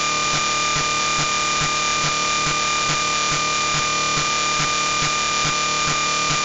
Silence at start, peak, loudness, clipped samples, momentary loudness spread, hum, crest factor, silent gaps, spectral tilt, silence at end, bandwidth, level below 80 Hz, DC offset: 0 s; -4 dBFS; -18 LUFS; under 0.1%; 0 LU; none; 16 dB; none; -1 dB/octave; 0 s; 8.2 kHz; -44 dBFS; under 0.1%